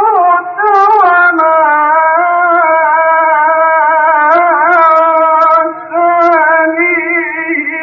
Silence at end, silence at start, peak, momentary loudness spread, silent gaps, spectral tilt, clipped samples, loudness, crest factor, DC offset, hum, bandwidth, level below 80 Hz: 0 s; 0 s; 0 dBFS; 5 LU; none; -1 dB/octave; under 0.1%; -8 LUFS; 8 dB; under 0.1%; none; 6.2 kHz; -60 dBFS